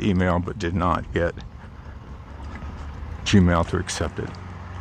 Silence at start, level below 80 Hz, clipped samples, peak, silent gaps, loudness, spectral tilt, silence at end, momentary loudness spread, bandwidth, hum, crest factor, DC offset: 0 s; -38 dBFS; under 0.1%; -4 dBFS; none; -23 LUFS; -6 dB/octave; 0 s; 21 LU; 10 kHz; none; 20 dB; under 0.1%